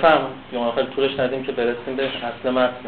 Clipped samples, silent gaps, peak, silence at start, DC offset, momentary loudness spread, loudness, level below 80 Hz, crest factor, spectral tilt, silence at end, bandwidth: under 0.1%; none; -4 dBFS; 0 s; 0.4%; 5 LU; -22 LUFS; -54 dBFS; 18 dB; -7.5 dB/octave; 0 s; 4.6 kHz